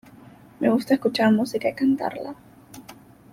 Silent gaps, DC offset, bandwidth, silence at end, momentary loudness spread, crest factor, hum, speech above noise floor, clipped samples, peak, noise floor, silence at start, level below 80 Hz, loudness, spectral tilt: none; under 0.1%; 16 kHz; 0.4 s; 24 LU; 18 dB; none; 26 dB; under 0.1%; -6 dBFS; -48 dBFS; 0.6 s; -64 dBFS; -22 LUFS; -6 dB/octave